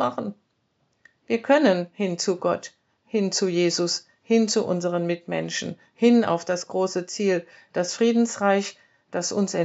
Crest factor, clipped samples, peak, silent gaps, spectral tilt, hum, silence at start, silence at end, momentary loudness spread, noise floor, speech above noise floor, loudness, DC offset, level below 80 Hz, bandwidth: 18 dB; under 0.1%; -6 dBFS; none; -4.5 dB/octave; none; 0 s; 0 s; 11 LU; -70 dBFS; 47 dB; -24 LUFS; under 0.1%; -80 dBFS; 8 kHz